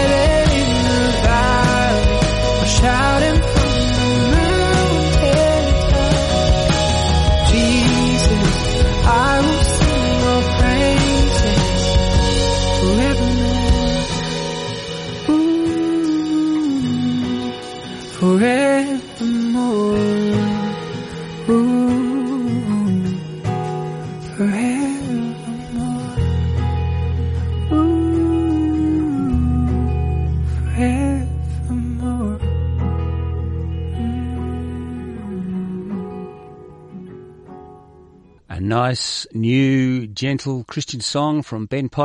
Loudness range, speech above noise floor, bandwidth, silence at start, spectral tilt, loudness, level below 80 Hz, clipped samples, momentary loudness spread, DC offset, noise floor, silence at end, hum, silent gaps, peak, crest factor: 9 LU; 25 dB; 11.5 kHz; 0 s; -5.5 dB/octave; -18 LUFS; -24 dBFS; under 0.1%; 11 LU; under 0.1%; -47 dBFS; 0 s; none; none; -4 dBFS; 14 dB